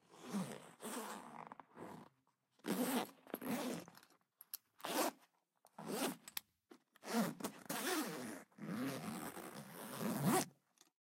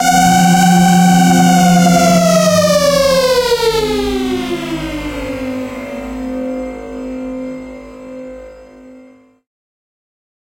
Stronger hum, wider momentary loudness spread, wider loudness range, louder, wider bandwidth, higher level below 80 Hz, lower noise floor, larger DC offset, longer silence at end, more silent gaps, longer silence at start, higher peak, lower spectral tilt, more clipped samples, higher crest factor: neither; second, 16 LU vs 19 LU; second, 3 LU vs 19 LU; second, -44 LUFS vs -12 LUFS; about the same, 16 kHz vs 16.5 kHz; second, -88 dBFS vs -36 dBFS; first, -81 dBFS vs -43 dBFS; neither; second, 0.6 s vs 1.45 s; neither; about the same, 0.1 s vs 0 s; second, -22 dBFS vs 0 dBFS; about the same, -4 dB/octave vs -5 dB/octave; neither; first, 22 dB vs 12 dB